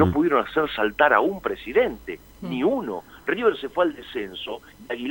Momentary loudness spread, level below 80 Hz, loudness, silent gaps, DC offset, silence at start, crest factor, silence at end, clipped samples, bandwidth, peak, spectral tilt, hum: 16 LU; -50 dBFS; -23 LUFS; none; under 0.1%; 0 s; 20 dB; 0 s; under 0.1%; 16.5 kHz; -2 dBFS; -7 dB/octave; none